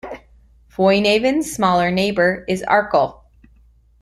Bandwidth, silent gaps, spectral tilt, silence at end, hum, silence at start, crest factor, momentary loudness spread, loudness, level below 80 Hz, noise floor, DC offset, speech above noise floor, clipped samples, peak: 13.5 kHz; none; -5 dB/octave; 0.9 s; none; 0.05 s; 18 dB; 11 LU; -17 LUFS; -48 dBFS; -52 dBFS; under 0.1%; 35 dB; under 0.1%; -2 dBFS